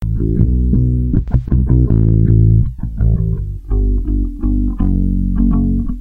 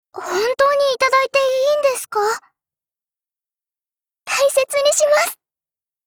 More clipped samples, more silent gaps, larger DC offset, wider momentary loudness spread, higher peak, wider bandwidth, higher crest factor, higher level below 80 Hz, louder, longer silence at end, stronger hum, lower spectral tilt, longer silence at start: neither; neither; neither; about the same, 8 LU vs 7 LU; first, 0 dBFS vs -4 dBFS; second, 1.8 kHz vs over 20 kHz; about the same, 12 dB vs 16 dB; first, -16 dBFS vs -62 dBFS; about the same, -15 LUFS vs -17 LUFS; second, 0 s vs 0.7 s; neither; first, -12.5 dB/octave vs 0 dB/octave; second, 0 s vs 0.15 s